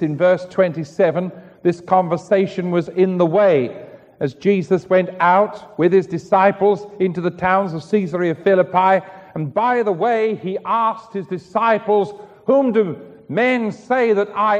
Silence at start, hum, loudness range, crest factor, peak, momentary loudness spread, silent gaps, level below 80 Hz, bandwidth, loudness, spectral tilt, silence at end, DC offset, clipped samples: 0 s; none; 2 LU; 16 dB; -2 dBFS; 10 LU; none; -62 dBFS; 8.6 kHz; -18 LUFS; -7.5 dB/octave; 0 s; under 0.1%; under 0.1%